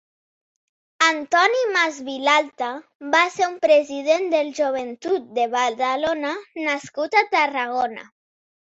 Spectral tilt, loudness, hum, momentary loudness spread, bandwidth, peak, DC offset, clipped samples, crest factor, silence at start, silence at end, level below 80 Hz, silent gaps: -1.5 dB/octave; -21 LUFS; none; 10 LU; 8 kHz; -4 dBFS; under 0.1%; under 0.1%; 18 dB; 1 s; 0.65 s; -70 dBFS; 2.95-3.00 s